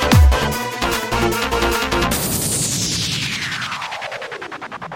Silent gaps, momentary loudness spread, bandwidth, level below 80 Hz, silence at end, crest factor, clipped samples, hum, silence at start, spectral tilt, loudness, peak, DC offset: none; 12 LU; 17 kHz; -24 dBFS; 0 s; 16 dB; under 0.1%; none; 0 s; -3.5 dB/octave; -19 LUFS; -2 dBFS; under 0.1%